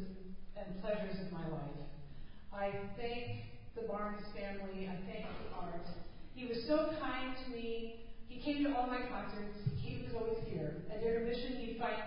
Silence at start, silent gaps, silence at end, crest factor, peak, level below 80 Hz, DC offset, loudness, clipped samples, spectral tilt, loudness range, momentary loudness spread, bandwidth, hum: 0 s; none; 0 s; 18 dB; -22 dBFS; -54 dBFS; under 0.1%; -42 LUFS; under 0.1%; -5 dB/octave; 5 LU; 15 LU; 5.2 kHz; none